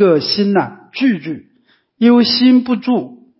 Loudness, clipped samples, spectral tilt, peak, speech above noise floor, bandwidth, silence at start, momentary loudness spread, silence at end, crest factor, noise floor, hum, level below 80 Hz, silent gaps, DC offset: -14 LUFS; under 0.1%; -9 dB/octave; -2 dBFS; 44 dB; 5.8 kHz; 0 s; 13 LU; 0.25 s; 12 dB; -57 dBFS; none; -58 dBFS; none; under 0.1%